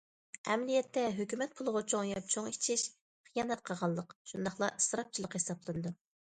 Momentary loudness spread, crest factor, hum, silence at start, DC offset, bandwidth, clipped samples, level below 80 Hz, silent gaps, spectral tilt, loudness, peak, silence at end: 9 LU; 20 dB; none; 0.45 s; under 0.1%; 10.5 kHz; under 0.1%; -72 dBFS; 3.01-3.24 s, 4.15-4.25 s; -3.5 dB/octave; -36 LUFS; -18 dBFS; 0.35 s